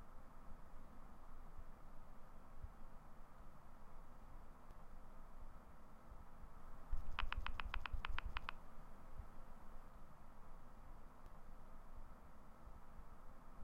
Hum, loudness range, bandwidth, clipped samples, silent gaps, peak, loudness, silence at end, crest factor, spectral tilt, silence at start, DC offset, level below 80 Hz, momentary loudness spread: none; 12 LU; 5.6 kHz; under 0.1%; none; -24 dBFS; -57 LUFS; 0 s; 24 dB; -5 dB/octave; 0 s; under 0.1%; -52 dBFS; 15 LU